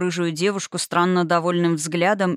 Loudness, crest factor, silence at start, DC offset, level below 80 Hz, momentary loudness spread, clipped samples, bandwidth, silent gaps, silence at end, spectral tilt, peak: -21 LUFS; 14 dB; 0 s; under 0.1%; -78 dBFS; 4 LU; under 0.1%; 15 kHz; none; 0 s; -5 dB/octave; -6 dBFS